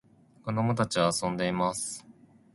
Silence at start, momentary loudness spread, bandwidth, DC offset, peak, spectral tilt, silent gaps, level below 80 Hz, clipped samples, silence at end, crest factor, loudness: 0.45 s; 11 LU; 11.5 kHz; under 0.1%; -10 dBFS; -4.5 dB/octave; none; -60 dBFS; under 0.1%; 0.4 s; 20 dB; -29 LUFS